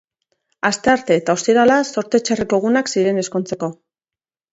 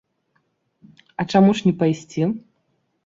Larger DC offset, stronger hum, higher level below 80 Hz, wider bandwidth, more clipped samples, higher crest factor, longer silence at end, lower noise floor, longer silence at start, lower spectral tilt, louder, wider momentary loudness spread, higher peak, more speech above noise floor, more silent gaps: neither; neither; about the same, -56 dBFS vs -60 dBFS; about the same, 8 kHz vs 7.6 kHz; neither; about the same, 18 dB vs 18 dB; first, 0.8 s vs 0.65 s; first, under -90 dBFS vs -69 dBFS; second, 0.65 s vs 1.2 s; second, -4.5 dB/octave vs -7 dB/octave; about the same, -17 LUFS vs -19 LUFS; second, 9 LU vs 15 LU; first, 0 dBFS vs -4 dBFS; first, over 73 dB vs 51 dB; neither